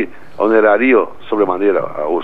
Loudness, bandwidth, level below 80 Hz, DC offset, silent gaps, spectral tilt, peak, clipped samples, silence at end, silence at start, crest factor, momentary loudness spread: -14 LUFS; 4.6 kHz; -54 dBFS; 3%; none; -7.5 dB/octave; 0 dBFS; under 0.1%; 0 s; 0 s; 14 dB; 9 LU